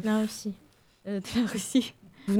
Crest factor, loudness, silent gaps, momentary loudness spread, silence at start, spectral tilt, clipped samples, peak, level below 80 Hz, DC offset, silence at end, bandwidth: 16 dB; -30 LUFS; none; 13 LU; 0 s; -5 dB/octave; under 0.1%; -14 dBFS; -60 dBFS; under 0.1%; 0 s; 17 kHz